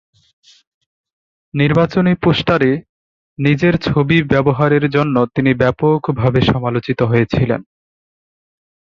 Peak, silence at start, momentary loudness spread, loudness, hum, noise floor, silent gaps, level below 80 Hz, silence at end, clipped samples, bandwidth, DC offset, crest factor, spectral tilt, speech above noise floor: -2 dBFS; 1.55 s; 5 LU; -15 LUFS; none; under -90 dBFS; 2.89-3.37 s; -40 dBFS; 1.25 s; under 0.1%; 7 kHz; under 0.1%; 14 dB; -8.5 dB/octave; over 76 dB